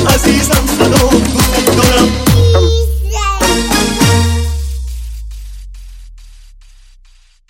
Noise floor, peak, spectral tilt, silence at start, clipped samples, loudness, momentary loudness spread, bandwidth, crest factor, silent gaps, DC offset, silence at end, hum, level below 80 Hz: -44 dBFS; 0 dBFS; -4.5 dB/octave; 0 s; 0.1%; -11 LUFS; 16 LU; 17.5 kHz; 12 dB; none; under 0.1%; 1.05 s; none; -18 dBFS